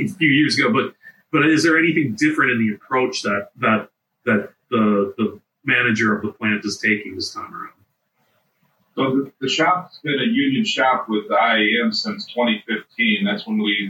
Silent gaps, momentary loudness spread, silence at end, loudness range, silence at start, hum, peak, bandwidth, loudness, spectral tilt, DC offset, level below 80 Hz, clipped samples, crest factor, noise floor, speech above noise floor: none; 10 LU; 0 s; 5 LU; 0 s; none; -4 dBFS; 16.5 kHz; -19 LUFS; -4.5 dB/octave; under 0.1%; -70 dBFS; under 0.1%; 16 dB; -67 dBFS; 48 dB